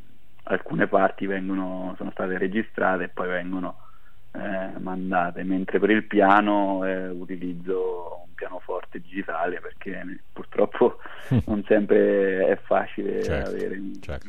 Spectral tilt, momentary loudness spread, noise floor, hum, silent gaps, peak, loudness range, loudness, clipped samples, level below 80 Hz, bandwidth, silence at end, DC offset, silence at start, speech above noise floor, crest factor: -8 dB/octave; 16 LU; -54 dBFS; none; none; -4 dBFS; 7 LU; -25 LUFS; under 0.1%; -50 dBFS; 9.6 kHz; 0 s; 2%; 0.45 s; 30 dB; 22 dB